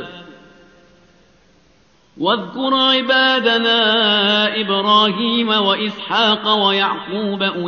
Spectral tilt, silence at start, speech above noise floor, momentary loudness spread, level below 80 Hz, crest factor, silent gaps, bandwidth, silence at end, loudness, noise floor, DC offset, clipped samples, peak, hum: -0.5 dB/octave; 0 s; 38 dB; 7 LU; -62 dBFS; 16 dB; none; 6.6 kHz; 0 s; -15 LUFS; -54 dBFS; under 0.1%; under 0.1%; -2 dBFS; none